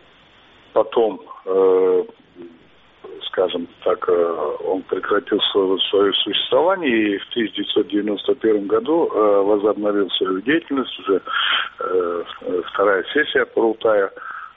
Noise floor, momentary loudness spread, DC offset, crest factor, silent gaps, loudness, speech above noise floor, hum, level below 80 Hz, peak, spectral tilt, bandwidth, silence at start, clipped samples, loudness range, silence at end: -50 dBFS; 7 LU; under 0.1%; 16 dB; none; -19 LUFS; 31 dB; none; -62 dBFS; -4 dBFS; -1 dB/octave; 4 kHz; 0.75 s; under 0.1%; 3 LU; 0.1 s